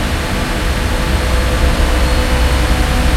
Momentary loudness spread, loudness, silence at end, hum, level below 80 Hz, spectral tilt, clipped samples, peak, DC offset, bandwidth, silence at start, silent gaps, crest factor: 3 LU; -15 LUFS; 0 s; none; -14 dBFS; -5 dB/octave; under 0.1%; 0 dBFS; under 0.1%; 15.5 kHz; 0 s; none; 12 dB